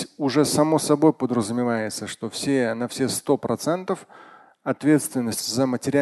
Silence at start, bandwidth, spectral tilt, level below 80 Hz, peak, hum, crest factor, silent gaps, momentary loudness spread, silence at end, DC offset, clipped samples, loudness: 0 s; 12.5 kHz; -5 dB/octave; -62 dBFS; -4 dBFS; none; 18 dB; none; 10 LU; 0 s; under 0.1%; under 0.1%; -23 LUFS